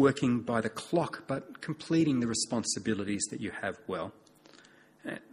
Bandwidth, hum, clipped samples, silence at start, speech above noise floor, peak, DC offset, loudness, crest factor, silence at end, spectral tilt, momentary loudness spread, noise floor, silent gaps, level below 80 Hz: 12.5 kHz; none; under 0.1%; 0 s; 27 dB; -12 dBFS; under 0.1%; -32 LUFS; 20 dB; 0.15 s; -4.5 dB/octave; 12 LU; -59 dBFS; none; -66 dBFS